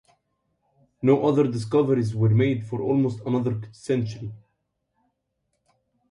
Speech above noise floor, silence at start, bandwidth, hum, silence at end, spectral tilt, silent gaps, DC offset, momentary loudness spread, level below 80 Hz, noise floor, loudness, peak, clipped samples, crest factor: 54 dB; 1 s; 11 kHz; none; 1.75 s; -8.5 dB/octave; none; under 0.1%; 11 LU; -60 dBFS; -76 dBFS; -23 LUFS; -6 dBFS; under 0.1%; 18 dB